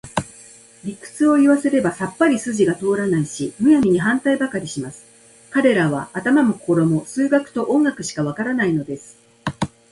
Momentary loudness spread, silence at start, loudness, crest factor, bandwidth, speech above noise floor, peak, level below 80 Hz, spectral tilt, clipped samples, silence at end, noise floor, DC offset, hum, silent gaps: 15 LU; 0.05 s; -19 LUFS; 18 dB; 11.5 kHz; 27 dB; -2 dBFS; -54 dBFS; -6 dB/octave; under 0.1%; 0.25 s; -45 dBFS; under 0.1%; none; none